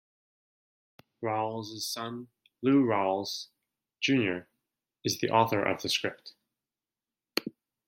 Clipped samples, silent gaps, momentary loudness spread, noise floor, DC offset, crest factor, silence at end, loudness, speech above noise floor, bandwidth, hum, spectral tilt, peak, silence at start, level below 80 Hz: under 0.1%; none; 14 LU; under -90 dBFS; under 0.1%; 24 dB; 0.35 s; -30 LUFS; over 61 dB; 16.5 kHz; none; -4.5 dB/octave; -8 dBFS; 1.2 s; -76 dBFS